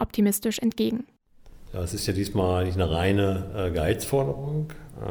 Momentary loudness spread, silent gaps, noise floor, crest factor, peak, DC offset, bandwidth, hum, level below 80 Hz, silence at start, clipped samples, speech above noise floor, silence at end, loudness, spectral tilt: 11 LU; none; -49 dBFS; 16 dB; -10 dBFS; under 0.1%; over 20 kHz; none; -42 dBFS; 0 s; under 0.1%; 24 dB; 0 s; -26 LUFS; -6 dB/octave